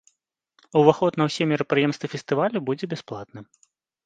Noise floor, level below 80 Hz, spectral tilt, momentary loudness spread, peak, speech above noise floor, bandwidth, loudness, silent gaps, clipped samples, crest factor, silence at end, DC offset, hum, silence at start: -74 dBFS; -68 dBFS; -6.5 dB/octave; 15 LU; 0 dBFS; 51 dB; 9.2 kHz; -23 LUFS; none; under 0.1%; 24 dB; 0.6 s; under 0.1%; none; 0.75 s